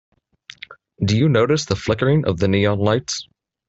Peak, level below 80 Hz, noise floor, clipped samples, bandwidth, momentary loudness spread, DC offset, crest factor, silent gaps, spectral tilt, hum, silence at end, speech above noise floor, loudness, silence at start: -4 dBFS; -50 dBFS; -46 dBFS; under 0.1%; 8.2 kHz; 22 LU; under 0.1%; 16 dB; none; -6 dB/octave; none; 0.45 s; 28 dB; -19 LUFS; 0.7 s